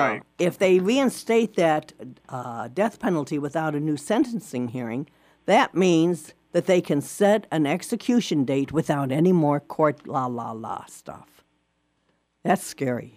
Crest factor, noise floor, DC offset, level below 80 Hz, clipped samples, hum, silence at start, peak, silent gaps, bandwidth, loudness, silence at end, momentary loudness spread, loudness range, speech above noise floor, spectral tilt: 16 dB; -71 dBFS; under 0.1%; -66 dBFS; under 0.1%; none; 0 s; -8 dBFS; none; 15.5 kHz; -23 LUFS; 0.1 s; 14 LU; 5 LU; 47 dB; -6 dB/octave